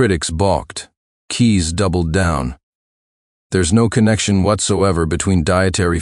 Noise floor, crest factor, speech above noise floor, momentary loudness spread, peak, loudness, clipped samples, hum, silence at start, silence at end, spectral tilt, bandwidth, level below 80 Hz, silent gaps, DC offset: under -90 dBFS; 16 dB; over 75 dB; 8 LU; 0 dBFS; -16 LUFS; under 0.1%; none; 0 s; 0 s; -5 dB/octave; 12 kHz; -32 dBFS; 0.97-1.28 s, 2.63-3.50 s; under 0.1%